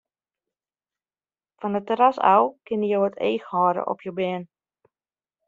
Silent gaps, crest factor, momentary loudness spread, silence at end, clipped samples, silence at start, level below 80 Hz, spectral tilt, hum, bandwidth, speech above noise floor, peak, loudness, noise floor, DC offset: none; 22 dB; 10 LU; 1 s; under 0.1%; 1.6 s; -72 dBFS; -4.5 dB/octave; none; 7.4 kHz; over 68 dB; -4 dBFS; -23 LUFS; under -90 dBFS; under 0.1%